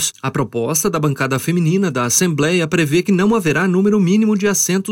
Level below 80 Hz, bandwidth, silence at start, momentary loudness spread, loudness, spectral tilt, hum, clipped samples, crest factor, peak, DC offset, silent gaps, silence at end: -52 dBFS; 16.5 kHz; 0 s; 4 LU; -16 LUFS; -4.5 dB/octave; none; under 0.1%; 14 dB; 0 dBFS; under 0.1%; none; 0 s